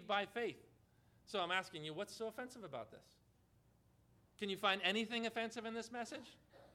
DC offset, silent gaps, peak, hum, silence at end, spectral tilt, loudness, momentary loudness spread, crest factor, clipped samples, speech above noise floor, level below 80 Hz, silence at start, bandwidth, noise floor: under 0.1%; none; -20 dBFS; none; 0.05 s; -3.5 dB/octave; -42 LUFS; 14 LU; 24 dB; under 0.1%; 30 dB; -80 dBFS; 0 s; 17.5 kHz; -73 dBFS